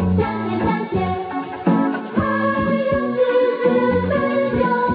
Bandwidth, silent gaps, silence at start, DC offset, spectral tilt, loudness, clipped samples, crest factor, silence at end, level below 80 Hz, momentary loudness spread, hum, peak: 5 kHz; none; 0 s; under 0.1%; -11 dB/octave; -19 LUFS; under 0.1%; 14 dB; 0 s; -44 dBFS; 5 LU; none; -4 dBFS